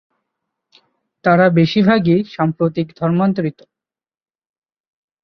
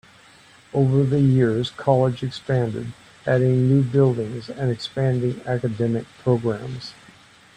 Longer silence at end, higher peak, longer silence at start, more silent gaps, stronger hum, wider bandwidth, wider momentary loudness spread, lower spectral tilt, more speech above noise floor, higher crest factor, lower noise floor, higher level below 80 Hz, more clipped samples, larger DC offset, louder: first, 1.75 s vs 0.65 s; about the same, -2 dBFS vs -4 dBFS; first, 1.25 s vs 0.75 s; neither; neither; second, 6.2 kHz vs 9 kHz; second, 8 LU vs 12 LU; about the same, -8.5 dB/octave vs -8 dB/octave; first, 63 dB vs 30 dB; about the same, 16 dB vs 18 dB; first, -77 dBFS vs -50 dBFS; about the same, -56 dBFS vs -54 dBFS; neither; neither; first, -16 LUFS vs -21 LUFS